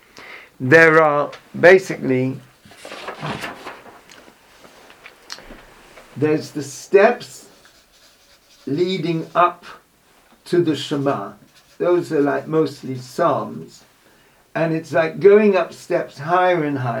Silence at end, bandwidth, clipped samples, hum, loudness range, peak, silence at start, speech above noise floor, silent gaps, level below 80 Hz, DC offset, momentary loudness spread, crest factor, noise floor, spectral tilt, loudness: 0 s; 16.5 kHz; under 0.1%; none; 13 LU; 0 dBFS; 0.15 s; 37 dB; none; -60 dBFS; under 0.1%; 24 LU; 20 dB; -55 dBFS; -6 dB/octave; -18 LUFS